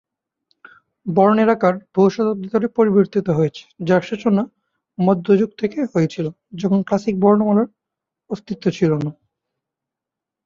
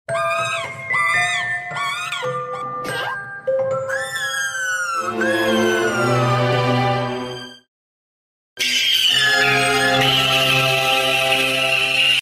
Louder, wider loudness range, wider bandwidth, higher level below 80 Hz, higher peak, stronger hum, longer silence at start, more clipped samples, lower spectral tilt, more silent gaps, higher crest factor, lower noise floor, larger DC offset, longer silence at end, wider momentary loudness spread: about the same, -18 LUFS vs -17 LUFS; second, 3 LU vs 8 LU; second, 7.2 kHz vs 16 kHz; about the same, -58 dBFS vs -54 dBFS; first, -2 dBFS vs -6 dBFS; neither; first, 1.05 s vs 0.1 s; neither; first, -8 dB/octave vs -3 dB/octave; second, none vs 7.68-8.56 s; about the same, 16 dB vs 14 dB; second, -85 dBFS vs under -90 dBFS; neither; first, 1.35 s vs 0 s; about the same, 13 LU vs 11 LU